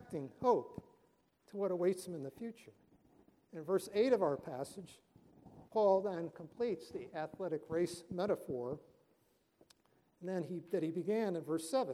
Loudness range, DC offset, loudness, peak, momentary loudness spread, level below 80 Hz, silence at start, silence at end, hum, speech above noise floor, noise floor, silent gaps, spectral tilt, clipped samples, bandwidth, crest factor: 5 LU; under 0.1%; -38 LUFS; -20 dBFS; 17 LU; -76 dBFS; 0 s; 0 s; none; 38 dB; -75 dBFS; none; -6 dB/octave; under 0.1%; 15.5 kHz; 20 dB